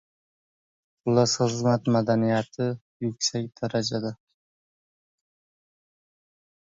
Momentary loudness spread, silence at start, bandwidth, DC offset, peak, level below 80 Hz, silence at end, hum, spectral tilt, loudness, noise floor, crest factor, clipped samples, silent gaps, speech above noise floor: 10 LU; 1.05 s; 7.8 kHz; under 0.1%; -8 dBFS; -64 dBFS; 2.5 s; none; -5 dB/octave; -26 LUFS; under -90 dBFS; 20 dB; under 0.1%; 2.81-3.00 s; over 65 dB